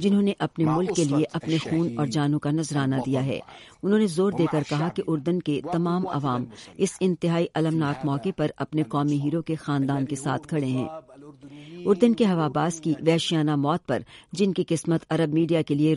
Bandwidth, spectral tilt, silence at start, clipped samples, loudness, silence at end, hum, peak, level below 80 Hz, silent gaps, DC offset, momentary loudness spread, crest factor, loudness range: 11.5 kHz; -6.5 dB/octave; 0 s; under 0.1%; -25 LUFS; 0 s; none; -6 dBFS; -60 dBFS; none; under 0.1%; 6 LU; 18 dB; 2 LU